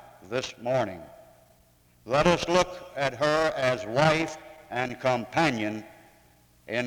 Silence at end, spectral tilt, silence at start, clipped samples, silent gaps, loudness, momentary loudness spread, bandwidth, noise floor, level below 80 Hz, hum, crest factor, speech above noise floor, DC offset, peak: 0 s; -5 dB/octave; 0.05 s; under 0.1%; none; -27 LUFS; 11 LU; over 20 kHz; -61 dBFS; -54 dBFS; none; 22 dB; 35 dB; under 0.1%; -6 dBFS